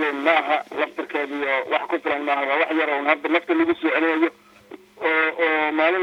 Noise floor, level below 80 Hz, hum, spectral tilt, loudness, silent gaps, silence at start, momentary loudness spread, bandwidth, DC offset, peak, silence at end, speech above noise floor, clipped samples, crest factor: -45 dBFS; -70 dBFS; none; -4.5 dB/octave; -21 LUFS; none; 0 s; 6 LU; 7.4 kHz; under 0.1%; -2 dBFS; 0 s; 24 dB; under 0.1%; 20 dB